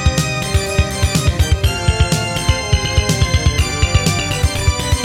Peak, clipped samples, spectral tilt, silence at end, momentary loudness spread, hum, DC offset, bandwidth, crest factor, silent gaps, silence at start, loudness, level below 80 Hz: -2 dBFS; under 0.1%; -4 dB/octave; 0 s; 2 LU; none; under 0.1%; 16.5 kHz; 14 dB; none; 0 s; -16 LUFS; -20 dBFS